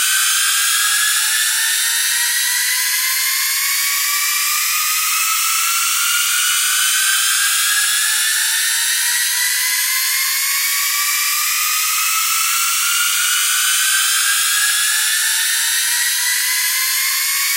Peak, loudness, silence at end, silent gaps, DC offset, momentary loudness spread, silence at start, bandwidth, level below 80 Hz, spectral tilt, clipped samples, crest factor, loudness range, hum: -2 dBFS; -14 LUFS; 0 s; none; under 0.1%; 2 LU; 0 s; 16 kHz; under -90 dBFS; 15 dB/octave; under 0.1%; 14 dB; 1 LU; none